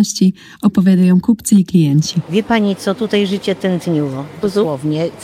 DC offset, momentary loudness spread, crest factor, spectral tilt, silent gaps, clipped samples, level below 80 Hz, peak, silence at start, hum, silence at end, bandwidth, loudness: under 0.1%; 7 LU; 12 dB; -6 dB/octave; none; under 0.1%; -50 dBFS; -2 dBFS; 0 s; none; 0 s; 14.5 kHz; -15 LUFS